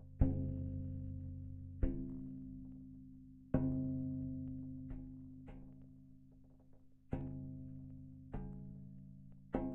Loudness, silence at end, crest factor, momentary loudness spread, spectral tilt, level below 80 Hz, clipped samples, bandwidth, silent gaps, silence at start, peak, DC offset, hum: -45 LUFS; 0 s; 24 dB; 20 LU; -10.5 dB/octave; -50 dBFS; under 0.1%; 3.3 kHz; none; 0 s; -18 dBFS; under 0.1%; none